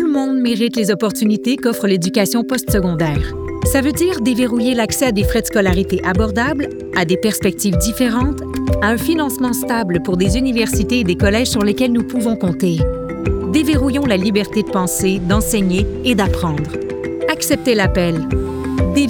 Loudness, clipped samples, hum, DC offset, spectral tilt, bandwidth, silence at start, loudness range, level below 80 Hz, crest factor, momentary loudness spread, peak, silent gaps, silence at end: -16 LUFS; under 0.1%; none; under 0.1%; -5 dB/octave; over 20 kHz; 0 s; 1 LU; -30 dBFS; 14 dB; 5 LU; -2 dBFS; none; 0 s